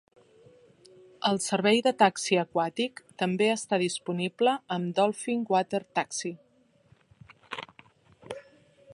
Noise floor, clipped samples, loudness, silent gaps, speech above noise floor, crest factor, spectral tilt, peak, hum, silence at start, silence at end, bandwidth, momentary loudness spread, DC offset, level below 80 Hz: -63 dBFS; under 0.1%; -27 LUFS; none; 36 dB; 24 dB; -4 dB/octave; -6 dBFS; none; 1.2 s; 0.55 s; 11.5 kHz; 17 LU; under 0.1%; -76 dBFS